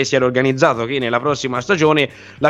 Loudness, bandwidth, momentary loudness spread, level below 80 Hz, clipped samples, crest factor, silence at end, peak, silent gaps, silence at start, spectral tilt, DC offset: -17 LUFS; 11 kHz; 5 LU; -52 dBFS; under 0.1%; 16 dB; 0 s; 0 dBFS; none; 0 s; -5 dB/octave; under 0.1%